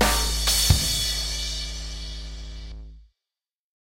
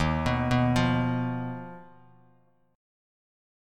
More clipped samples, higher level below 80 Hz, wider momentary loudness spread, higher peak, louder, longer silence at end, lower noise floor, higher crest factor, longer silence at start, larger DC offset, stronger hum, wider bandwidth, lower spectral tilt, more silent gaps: neither; first, -32 dBFS vs -44 dBFS; first, 20 LU vs 14 LU; first, -4 dBFS vs -12 dBFS; first, -23 LUFS vs -27 LUFS; second, 0.85 s vs 1.9 s; first, under -90 dBFS vs -64 dBFS; about the same, 22 dB vs 18 dB; about the same, 0 s vs 0 s; neither; neither; first, 16 kHz vs 11 kHz; second, -2.5 dB/octave vs -7 dB/octave; neither